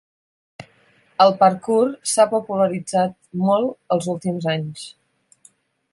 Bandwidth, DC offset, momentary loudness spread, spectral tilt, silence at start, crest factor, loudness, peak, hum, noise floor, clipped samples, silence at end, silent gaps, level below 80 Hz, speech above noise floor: 11.5 kHz; under 0.1%; 10 LU; -5 dB/octave; 0.6 s; 20 dB; -19 LUFS; -2 dBFS; none; -57 dBFS; under 0.1%; 1.05 s; none; -66 dBFS; 38 dB